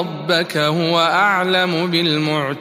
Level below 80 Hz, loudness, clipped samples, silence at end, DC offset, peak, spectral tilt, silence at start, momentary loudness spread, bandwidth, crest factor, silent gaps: -64 dBFS; -16 LUFS; under 0.1%; 0 s; under 0.1%; -2 dBFS; -5 dB/octave; 0 s; 4 LU; 15.5 kHz; 14 dB; none